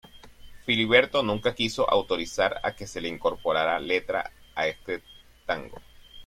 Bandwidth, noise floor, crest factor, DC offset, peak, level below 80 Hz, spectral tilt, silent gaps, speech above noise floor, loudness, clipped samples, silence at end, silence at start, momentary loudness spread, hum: 14.5 kHz; -47 dBFS; 22 dB; under 0.1%; -6 dBFS; -52 dBFS; -4 dB/octave; none; 21 dB; -26 LUFS; under 0.1%; 0 s; 0.15 s; 15 LU; none